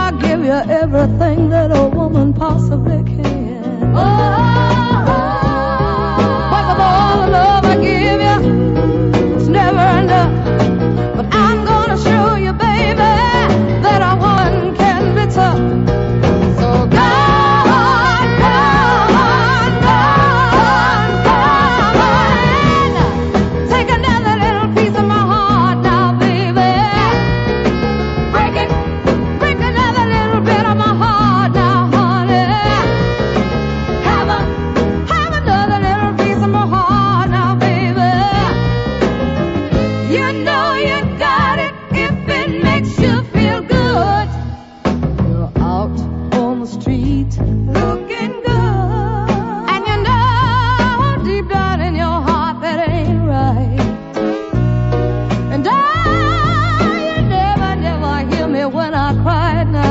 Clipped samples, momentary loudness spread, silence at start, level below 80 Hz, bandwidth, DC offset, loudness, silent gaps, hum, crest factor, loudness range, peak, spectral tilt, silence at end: under 0.1%; 6 LU; 0 s; -26 dBFS; 7.8 kHz; under 0.1%; -13 LUFS; none; none; 12 dB; 5 LU; -2 dBFS; -7 dB/octave; 0 s